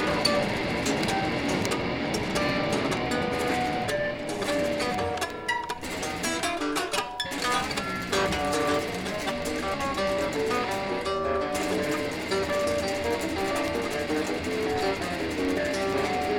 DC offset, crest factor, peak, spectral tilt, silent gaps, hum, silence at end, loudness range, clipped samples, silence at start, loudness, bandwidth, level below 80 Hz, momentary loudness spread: under 0.1%; 18 dB; -8 dBFS; -4 dB/octave; none; none; 0 s; 2 LU; under 0.1%; 0 s; -27 LUFS; 19.5 kHz; -48 dBFS; 4 LU